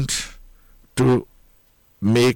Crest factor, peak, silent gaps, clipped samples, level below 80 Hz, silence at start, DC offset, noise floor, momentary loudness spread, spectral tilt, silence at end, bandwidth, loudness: 14 dB; -8 dBFS; none; under 0.1%; -44 dBFS; 0 s; under 0.1%; -57 dBFS; 12 LU; -5 dB/octave; 0 s; 17.5 kHz; -21 LUFS